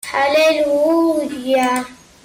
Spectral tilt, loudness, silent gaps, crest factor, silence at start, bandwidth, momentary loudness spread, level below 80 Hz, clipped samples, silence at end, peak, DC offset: -3 dB/octave; -16 LUFS; none; 10 dB; 0.05 s; 16.5 kHz; 8 LU; -56 dBFS; under 0.1%; 0.3 s; -6 dBFS; under 0.1%